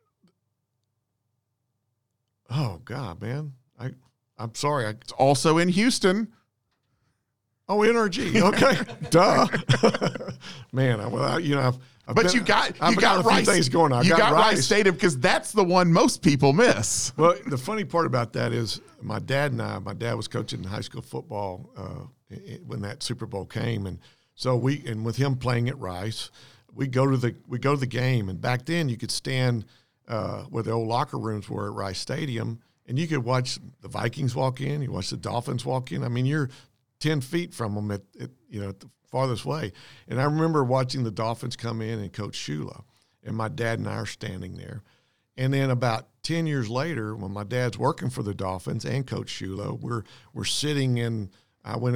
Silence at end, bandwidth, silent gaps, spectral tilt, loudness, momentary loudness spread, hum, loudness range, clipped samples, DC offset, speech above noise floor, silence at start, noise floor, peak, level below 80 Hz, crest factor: 0 s; 16 kHz; none; -5 dB/octave; -25 LUFS; 16 LU; none; 12 LU; under 0.1%; 0.2%; 53 dB; 0 s; -78 dBFS; -4 dBFS; -58 dBFS; 22 dB